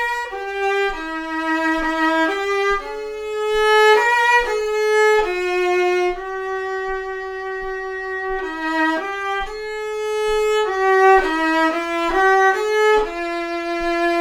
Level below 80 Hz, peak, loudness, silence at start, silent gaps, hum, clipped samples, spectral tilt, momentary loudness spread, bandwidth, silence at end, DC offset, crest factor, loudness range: -42 dBFS; -2 dBFS; -19 LUFS; 0 s; none; none; under 0.1%; -2.5 dB/octave; 12 LU; 18 kHz; 0 s; under 0.1%; 18 dB; 7 LU